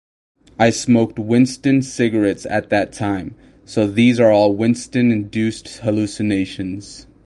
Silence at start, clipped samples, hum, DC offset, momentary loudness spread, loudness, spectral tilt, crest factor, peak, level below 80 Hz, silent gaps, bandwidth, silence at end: 0.6 s; under 0.1%; none; under 0.1%; 12 LU; -17 LUFS; -6 dB/octave; 16 dB; 0 dBFS; -48 dBFS; none; 11.5 kHz; 0.25 s